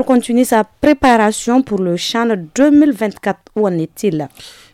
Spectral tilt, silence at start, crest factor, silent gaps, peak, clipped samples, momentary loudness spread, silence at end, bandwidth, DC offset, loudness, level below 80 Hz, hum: -5 dB/octave; 0 s; 12 dB; none; -2 dBFS; under 0.1%; 8 LU; 0.25 s; 15.5 kHz; under 0.1%; -14 LUFS; -44 dBFS; none